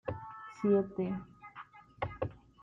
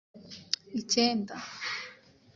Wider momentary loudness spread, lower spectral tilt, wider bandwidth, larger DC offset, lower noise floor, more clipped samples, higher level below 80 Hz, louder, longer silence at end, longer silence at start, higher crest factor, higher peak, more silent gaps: about the same, 21 LU vs 20 LU; first, -9 dB/octave vs -2.5 dB/octave; about the same, 7.4 kHz vs 7.8 kHz; neither; about the same, -54 dBFS vs -53 dBFS; neither; first, -62 dBFS vs -74 dBFS; second, -35 LUFS vs -31 LUFS; second, 0.25 s vs 0.4 s; about the same, 0.05 s vs 0.15 s; second, 18 dB vs 24 dB; second, -18 dBFS vs -8 dBFS; neither